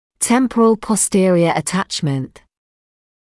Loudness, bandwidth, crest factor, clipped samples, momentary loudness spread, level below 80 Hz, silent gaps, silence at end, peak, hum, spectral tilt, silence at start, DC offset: -16 LUFS; 12 kHz; 14 dB; under 0.1%; 8 LU; -52 dBFS; none; 1.1 s; -4 dBFS; none; -4.5 dB/octave; 0.2 s; under 0.1%